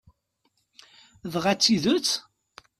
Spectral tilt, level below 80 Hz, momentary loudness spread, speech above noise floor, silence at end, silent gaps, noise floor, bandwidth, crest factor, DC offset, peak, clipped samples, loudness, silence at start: -3.5 dB/octave; -64 dBFS; 12 LU; 49 dB; 0.6 s; none; -73 dBFS; 14.5 kHz; 20 dB; under 0.1%; -8 dBFS; under 0.1%; -23 LUFS; 1.25 s